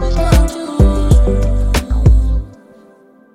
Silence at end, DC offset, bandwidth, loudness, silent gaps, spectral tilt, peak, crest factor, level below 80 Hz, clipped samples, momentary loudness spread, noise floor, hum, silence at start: 0.85 s; under 0.1%; 13.5 kHz; -14 LUFS; none; -6.5 dB/octave; 0 dBFS; 12 dB; -14 dBFS; under 0.1%; 7 LU; -45 dBFS; none; 0 s